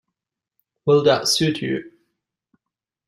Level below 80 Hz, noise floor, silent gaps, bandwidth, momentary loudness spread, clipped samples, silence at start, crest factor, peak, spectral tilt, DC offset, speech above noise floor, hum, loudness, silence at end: -62 dBFS; -86 dBFS; none; 15.5 kHz; 11 LU; under 0.1%; 0.85 s; 20 dB; -4 dBFS; -4 dB/octave; under 0.1%; 67 dB; none; -19 LUFS; 1.2 s